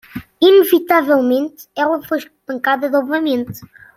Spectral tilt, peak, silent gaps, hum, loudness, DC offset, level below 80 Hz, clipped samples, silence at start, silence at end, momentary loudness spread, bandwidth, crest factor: -4.5 dB/octave; -2 dBFS; none; none; -15 LUFS; under 0.1%; -58 dBFS; under 0.1%; 0.15 s; 0.3 s; 16 LU; 16.5 kHz; 14 dB